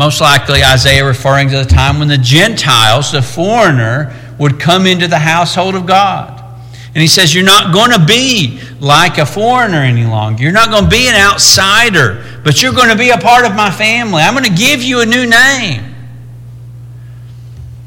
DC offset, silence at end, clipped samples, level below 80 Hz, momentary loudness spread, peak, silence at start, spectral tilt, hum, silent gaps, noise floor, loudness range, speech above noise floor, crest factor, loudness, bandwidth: under 0.1%; 0 s; 0.4%; -28 dBFS; 8 LU; 0 dBFS; 0 s; -3.5 dB/octave; none; none; -29 dBFS; 3 LU; 20 dB; 10 dB; -7 LUFS; over 20 kHz